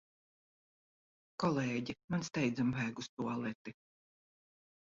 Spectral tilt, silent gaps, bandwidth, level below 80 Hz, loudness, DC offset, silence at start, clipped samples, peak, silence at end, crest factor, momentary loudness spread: -5.5 dB/octave; 2.04-2.08 s, 3.09-3.17 s, 3.55-3.65 s; 7.6 kHz; -72 dBFS; -37 LUFS; under 0.1%; 1.4 s; under 0.1%; -20 dBFS; 1.15 s; 20 dB; 12 LU